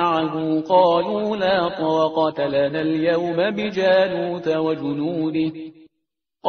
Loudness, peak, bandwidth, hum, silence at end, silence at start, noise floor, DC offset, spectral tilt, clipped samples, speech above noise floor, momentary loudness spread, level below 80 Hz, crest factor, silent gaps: -20 LUFS; -4 dBFS; 6.6 kHz; none; 0 s; 0 s; -79 dBFS; under 0.1%; -4 dB/octave; under 0.1%; 59 dB; 7 LU; -60 dBFS; 16 dB; none